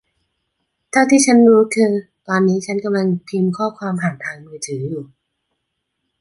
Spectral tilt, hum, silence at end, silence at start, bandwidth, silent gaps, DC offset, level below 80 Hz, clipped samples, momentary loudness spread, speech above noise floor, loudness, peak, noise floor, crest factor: -5.5 dB/octave; none; 1.15 s; 0.95 s; 11.5 kHz; none; under 0.1%; -64 dBFS; under 0.1%; 17 LU; 59 dB; -16 LUFS; -2 dBFS; -74 dBFS; 16 dB